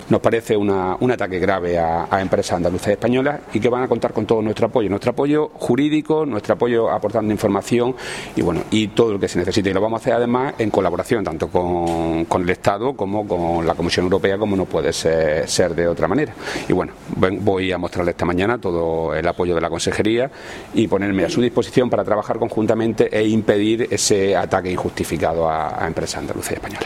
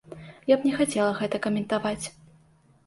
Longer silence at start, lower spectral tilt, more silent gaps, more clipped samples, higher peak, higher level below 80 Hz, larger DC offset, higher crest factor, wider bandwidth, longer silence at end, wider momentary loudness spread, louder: about the same, 0 s vs 0.1 s; about the same, -5.5 dB/octave vs -5 dB/octave; neither; neither; first, 0 dBFS vs -8 dBFS; first, -44 dBFS vs -60 dBFS; neither; about the same, 18 dB vs 20 dB; first, 15.5 kHz vs 12 kHz; second, 0 s vs 0.75 s; second, 4 LU vs 12 LU; first, -19 LUFS vs -26 LUFS